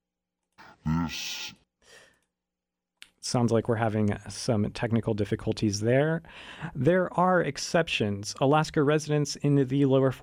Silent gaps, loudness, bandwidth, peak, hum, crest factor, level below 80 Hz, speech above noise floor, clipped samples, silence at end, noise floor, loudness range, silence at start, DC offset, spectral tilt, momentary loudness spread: none; -27 LUFS; over 20 kHz; -10 dBFS; none; 18 dB; -54 dBFS; 62 dB; under 0.1%; 0 s; -88 dBFS; 7 LU; 0.6 s; under 0.1%; -6 dB/octave; 10 LU